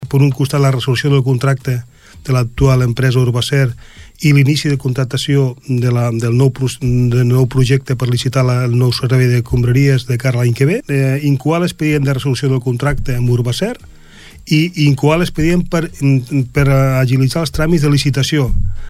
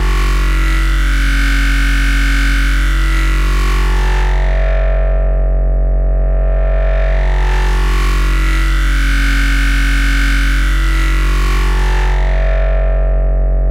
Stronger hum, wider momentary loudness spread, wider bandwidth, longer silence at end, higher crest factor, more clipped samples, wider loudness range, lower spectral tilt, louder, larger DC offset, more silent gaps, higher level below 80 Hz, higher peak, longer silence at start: neither; first, 5 LU vs 2 LU; first, 14.5 kHz vs 12.5 kHz; about the same, 0 s vs 0 s; about the same, 12 dB vs 8 dB; neither; about the same, 2 LU vs 1 LU; first, -6.5 dB/octave vs -5 dB/octave; about the same, -14 LUFS vs -15 LUFS; neither; neither; second, -28 dBFS vs -12 dBFS; about the same, 0 dBFS vs -2 dBFS; about the same, 0 s vs 0 s